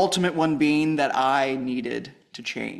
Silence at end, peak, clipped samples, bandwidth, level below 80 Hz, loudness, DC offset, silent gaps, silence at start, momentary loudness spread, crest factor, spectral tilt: 0 s; -8 dBFS; under 0.1%; 13 kHz; -64 dBFS; -23 LUFS; under 0.1%; none; 0 s; 12 LU; 16 dB; -5 dB/octave